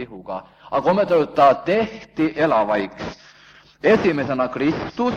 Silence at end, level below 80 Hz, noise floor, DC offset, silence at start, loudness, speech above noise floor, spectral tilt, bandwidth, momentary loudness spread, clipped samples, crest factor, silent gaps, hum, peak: 0 s; -52 dBFS; -49 dBFS; under 0.1%; 0 s; -19 LUFS; 30 dB; -7 dB/octave; 7.6 kHz; 16 LU; under 0.1%; 18 dB; none; none; -2 dBFS